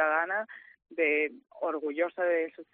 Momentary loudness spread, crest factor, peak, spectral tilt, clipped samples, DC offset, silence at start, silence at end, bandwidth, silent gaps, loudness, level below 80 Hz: 13 LU; 18 dB; -14 dBFS; -1 dB/octave; under 0.1%; under 0.1%; 0 s; 0.1 s; 3.9 kHz; none; -30 LUFS; -82 dBFS